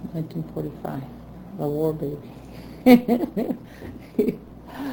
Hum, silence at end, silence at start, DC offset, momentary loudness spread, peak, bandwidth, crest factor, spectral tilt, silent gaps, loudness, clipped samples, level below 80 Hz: none; 0 s; 0 s; under 0.1%; 24 LU; 0 dBFS; over 20 kHz; 24 dB; -7.5 dB/octave; none; -24 LUFS; under 0.1%; -50 dBFS